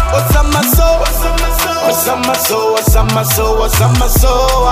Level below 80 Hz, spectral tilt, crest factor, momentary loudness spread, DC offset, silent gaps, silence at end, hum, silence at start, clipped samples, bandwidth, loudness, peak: -14 dBFS; -4 dB/octave; 10 dB; 3 LU; under 0.1%; none; 0 s; none; 0 s; under 0.1%; 16 kHz; -12 LUFS; 0 dBFS